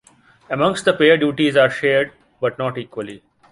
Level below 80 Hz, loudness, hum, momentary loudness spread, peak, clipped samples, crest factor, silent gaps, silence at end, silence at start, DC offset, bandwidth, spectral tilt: -58 dBFS; -18 LUFS; none; 15 LU; -2 dBFS; under 0.1%; 18 dB; none; 0.35 s; 0.5 s; under 0.1%; 11.5 kHz; -5 dB/octave